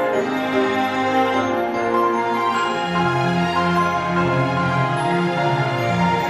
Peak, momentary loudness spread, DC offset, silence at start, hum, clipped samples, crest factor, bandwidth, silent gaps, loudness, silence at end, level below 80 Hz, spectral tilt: -6 dBFS; 2 LU; under 0.1%; 0 s; none; under 0.1%; 14 dB; 13 kHz; none; -19 LUFS; 0 s; -52 dBFS; -6 dB/octave